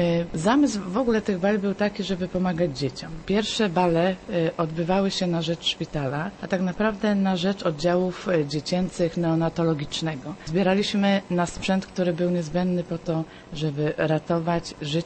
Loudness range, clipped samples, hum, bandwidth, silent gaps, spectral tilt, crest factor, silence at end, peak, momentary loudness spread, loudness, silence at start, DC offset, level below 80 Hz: 1 LU; under 0.1%; none; 8.8 kHz; none; -6 dB/octave; 18 dB; 0 s; -6 dBFS; 6 LU; -25 LUFS; 0 s; under 0.1%; -48 dBFS